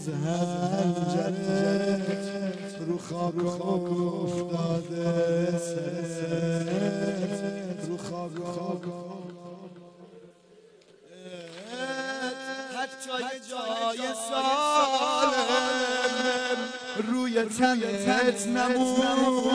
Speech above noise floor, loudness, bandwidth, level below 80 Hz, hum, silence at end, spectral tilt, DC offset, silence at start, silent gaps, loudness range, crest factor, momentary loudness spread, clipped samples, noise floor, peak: 29 dB; -28 LUFS; 11 kHz; -68 dBFS; none; 0 s; -5 dB/octave; under 0.1%; 0 s; none; 12 LU; 16 dB; 11 LU; under 0.1%; -56 dBFS; -12 dBFS